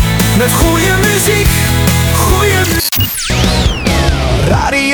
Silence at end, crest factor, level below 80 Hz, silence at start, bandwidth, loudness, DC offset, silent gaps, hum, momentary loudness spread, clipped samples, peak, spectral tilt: 0 s; 10 dB; -18 dBFS; 0 s; over 20 kHz; -10 LUFS; 0.2%; none; none; 3 LU; under 0.1%; 0 dBFS; -4 dB/octave